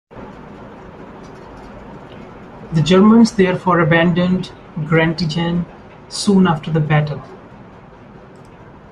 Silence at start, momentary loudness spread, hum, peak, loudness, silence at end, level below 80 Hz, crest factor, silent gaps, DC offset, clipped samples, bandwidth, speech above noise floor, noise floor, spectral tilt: 0.1 s; 25 LU; none; -2 dBFS; -15 LUFS; 1.55 s; -46 dBFS; 16 dB; none; under 0.1%; under 0.1%; 11 kHz; 26 dB; -40 dBFS; -6.5 dB/octave